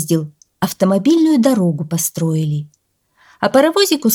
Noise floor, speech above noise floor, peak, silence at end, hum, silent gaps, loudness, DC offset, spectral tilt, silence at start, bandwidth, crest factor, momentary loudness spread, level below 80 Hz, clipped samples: -59 dBFS; 45 dB; -2 dBFS; 0 s; none; none; -15 LUFS; under 0.1%; -5 dB/octave; 0 s; 19.5 kHz; 14 dB; 10 LU; -60 dBFS; under 0.1%